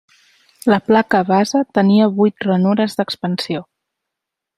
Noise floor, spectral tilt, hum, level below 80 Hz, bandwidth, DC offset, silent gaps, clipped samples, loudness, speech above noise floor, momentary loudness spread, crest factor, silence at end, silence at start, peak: -82 dBFS; -6.5 dB/octave; none; -60 dBFS; 12.5 kHz; under 0.1%; none; under 0.1%; -16 LUFS; 67 dB; 9 LU; 16 dB; 0.95 s; 0.65 s; 0 dBFS